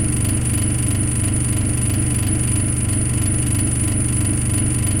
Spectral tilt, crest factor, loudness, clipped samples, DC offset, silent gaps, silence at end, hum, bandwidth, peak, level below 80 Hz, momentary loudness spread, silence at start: -4.5 dB/octave; 12 dB; -18 LUFS; under 0.1%; under 0.1%; none; 0 s; 50 Hz at -25 dBFS; 16.5 kHz; -6 dBFS; -26 dBFS; 1 LU; 0 s